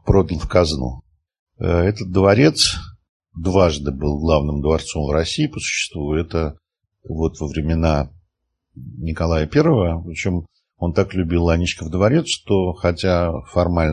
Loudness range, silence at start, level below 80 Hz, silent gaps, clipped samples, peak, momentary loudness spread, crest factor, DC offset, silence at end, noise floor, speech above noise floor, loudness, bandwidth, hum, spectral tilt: 5 LU; 0.05 s; -30 dBFS; 1.39-1.47 s, 3.09-3.20 s; under 0.1%; 0 dBFS; 11 LU; 18 dB; under 0.1%; 0 s; -73 dBFS; 55 dB; -19 LUFS; 12 kHz; none; -5.5 dB/octave